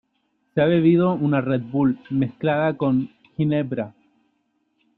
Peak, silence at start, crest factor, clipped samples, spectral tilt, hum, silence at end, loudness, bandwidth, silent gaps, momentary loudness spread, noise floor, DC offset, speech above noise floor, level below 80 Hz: -6 dBFS; 0.55 s; 16 dB; under 0.1%; -11 dB/octave; none; 1.1 s; -21 LUFS; 4.3 kHz; none; 11 LU; -70 dBFS; under 0.1%; 50 dB; -60 dBFS